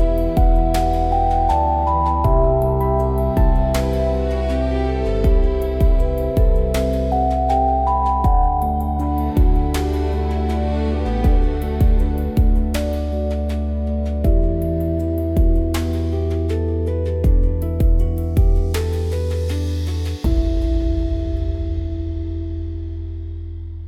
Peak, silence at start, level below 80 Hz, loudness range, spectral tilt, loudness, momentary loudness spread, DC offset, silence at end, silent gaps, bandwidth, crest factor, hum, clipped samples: -6 dBFS; 0 s; -20 dBFS; 4 LU; -8 dB/octave; -20 LUFS; 6 LU; under 0.1%; 0 s; none; 14.5 kHz; 12 dB; none; under 0.1%